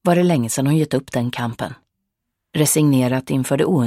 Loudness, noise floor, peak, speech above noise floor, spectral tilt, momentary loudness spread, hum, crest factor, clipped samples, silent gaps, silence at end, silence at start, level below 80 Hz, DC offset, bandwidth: -19 LUFS; -78 dBFS; -2 dBFS; 60 dB; -5.5 dB/octave; 10 LU; none; 16 dB; under 0.1%; none; 0 s; 0.05 s; -56 dBFS; under 0.1%; 16.5 kHz